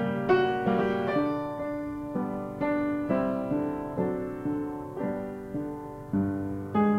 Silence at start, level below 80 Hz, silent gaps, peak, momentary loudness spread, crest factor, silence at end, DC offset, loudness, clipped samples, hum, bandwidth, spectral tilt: 0 s; -54 dBFS; none; -10 dBFS; 10 LU; 18 dB; 0 s; under 0.1%; -30 LUFS; under 0.1%; none; 14 kHz; -8.5 dB/octave